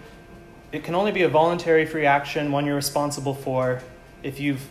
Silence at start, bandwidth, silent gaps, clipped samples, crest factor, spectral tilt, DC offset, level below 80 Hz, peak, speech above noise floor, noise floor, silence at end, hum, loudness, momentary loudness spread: 0 s; 15 kHz; none; under 0.1%; 18 dB; -5 dB/octave; under 0.1%; -52 dBFS; -6 dBFS; 23 dB; -45 dBFS; 0 s; none; -23 LUFS; 13 LU